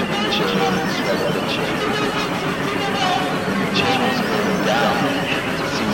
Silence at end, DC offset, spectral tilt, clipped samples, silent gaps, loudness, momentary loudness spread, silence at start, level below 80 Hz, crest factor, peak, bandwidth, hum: 0 s; under 0.1%; -4.5 dB/octave; under 0.1%; none; -19 LUFS; 4 LU; 0 s; -46 dBFS; 16 dB; -4 dBFS; 16.5 kHz; none